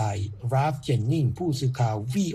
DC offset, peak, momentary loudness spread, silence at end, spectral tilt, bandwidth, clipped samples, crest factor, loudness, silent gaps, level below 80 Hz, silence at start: under 0.1%; -12 dBFS; 2 LU; 0 s; -7 dB/octave; 13 kHz; under 0.1%; 12 dB; -26 LUFS; none; -54 dBFS; 0 s